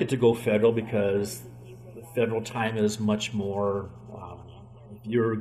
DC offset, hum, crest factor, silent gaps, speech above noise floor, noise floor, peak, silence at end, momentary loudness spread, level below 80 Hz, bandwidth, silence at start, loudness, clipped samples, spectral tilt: under 0.1%; none; 18 dB; none; 21 dB; -46 dBFS; -10 dBFS; 0 s; 22 LU; -60 dBFS; 15 kHz; 0 s; -26 LUFS; under 0.1%; -6 dB/octave